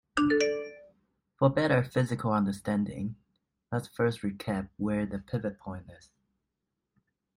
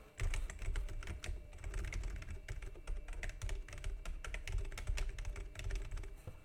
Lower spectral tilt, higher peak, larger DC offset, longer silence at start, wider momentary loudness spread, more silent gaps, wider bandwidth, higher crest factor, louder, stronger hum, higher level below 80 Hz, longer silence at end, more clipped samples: first, -6.5 dB/octave vs -4 dB/octave; first, -12 dBFS vs -26 dBFS; neither; first, 0.15 s vs 0 s; first, 13 LU vs 6 LU; neither; first, 15.5 kHz vs 13.5 kHz; about the same, 18 dB vs 16 dB; first, -30 LUFS vs -47 LUFS; neither; second, -60 dBFS vs -42 dBFS; first, 1.4 s vs 0 s; neither